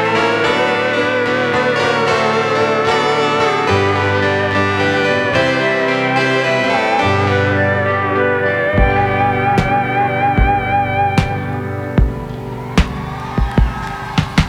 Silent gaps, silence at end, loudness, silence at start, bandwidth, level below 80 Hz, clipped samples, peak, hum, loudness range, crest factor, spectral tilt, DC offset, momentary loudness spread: none; 0 s; -15 LUFS; 0 s; 13.5 kHz; -26 dBFS; under 0.1%; 0 dBFS; none; 3 LU; 14 dB; -6 dB/octave; under 0.1%; 6 LU